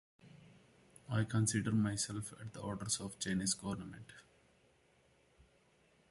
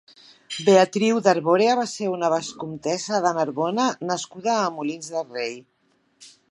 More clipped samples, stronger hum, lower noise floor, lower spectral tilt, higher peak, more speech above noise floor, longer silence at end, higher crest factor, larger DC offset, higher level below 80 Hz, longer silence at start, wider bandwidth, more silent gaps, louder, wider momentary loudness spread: neither; neither; first, -71 dBFS vs -58 dBFS; about the same, -4 dB/octave vs -4.5 dB/octave; second, -22 dBFS vs -2 dBFS; about the same, 33 dB vs 36 dB; first, 1.9 s vs 0.25 s; about the same, 20 dB vs 20 dB; neither; first, -66 dBFS vs -74 dBFS; second, 0.25 s vs 0.5 s; about the same, 12 kHz vs 11.5 kHz; neither; second, -38 LUFS vs -22 LUFS; about the same, 13 LU vs 12 LU